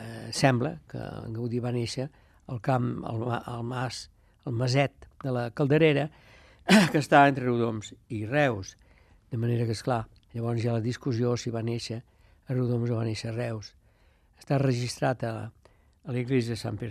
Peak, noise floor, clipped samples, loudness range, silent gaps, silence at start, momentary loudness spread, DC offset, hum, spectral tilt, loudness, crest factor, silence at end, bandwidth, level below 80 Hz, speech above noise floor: -6 dBFS; -62 dBFS; under 0.1%; 8 LU; none; 0 s; 16 LU; under 0.1%; none; -6 dB/octave; -28 LUFS; 22 dB; 0 s; 14 kHz; -60 dBFS; 35 dB